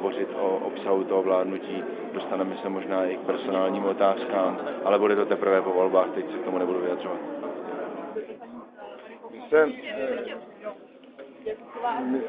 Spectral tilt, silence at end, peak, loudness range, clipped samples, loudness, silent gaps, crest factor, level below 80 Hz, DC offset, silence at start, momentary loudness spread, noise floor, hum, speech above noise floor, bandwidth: -9.5 dB/octave; 0 s; -6 dBFS; 6 LU; under 0.1%; -26 LUFS; none; 20 dB; -74 dBFS; under 0.1%; 0 s; 18 LU; -47 dBFS; none; 21 dB; 4.9 kHz